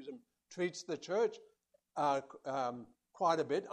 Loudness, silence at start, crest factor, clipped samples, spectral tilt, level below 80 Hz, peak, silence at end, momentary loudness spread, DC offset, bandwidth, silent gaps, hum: -37 LUFS; 0 s; 18 dB; under 0.1%; -4.5 dB/octave; -84 dBFS; -20 dBFS; 0 s; 18 LU; under 0.1%; 9.8 kHz; none; none